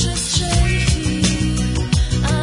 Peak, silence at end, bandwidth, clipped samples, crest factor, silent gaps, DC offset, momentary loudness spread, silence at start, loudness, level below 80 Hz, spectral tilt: -4 dBFS; 0 s; 11 kHz; under 0.1%; 12 dB; none; under 0.1%; 3 LU; 0 s; -18 LUFS; -22 dBFS; -4.5 dB/octave